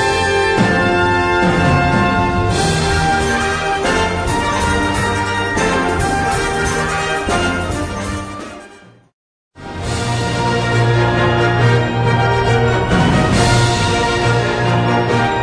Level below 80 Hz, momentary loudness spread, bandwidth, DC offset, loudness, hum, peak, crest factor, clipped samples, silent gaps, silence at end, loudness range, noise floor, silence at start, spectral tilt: -30 dBFS; 7 LU; 11 kHz; under 0.1%; -15 LUFS; none; -2 dBFS; 14 dB; under 0.1%; 9.13-9.51 s; 0 s; 7 LU; -42 dBFS; 0 s; -5 dB/octave